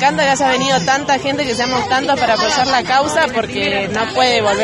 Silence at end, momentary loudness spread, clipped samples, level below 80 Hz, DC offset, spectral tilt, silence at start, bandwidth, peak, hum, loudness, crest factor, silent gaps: 0 s; 4 LU; under 0.1%; -46 dBFS; under 0.1%; -3 dB/octave; 0 s; 12 kHz; 0 dBFS; none; -15 LUFS; 14 dB; none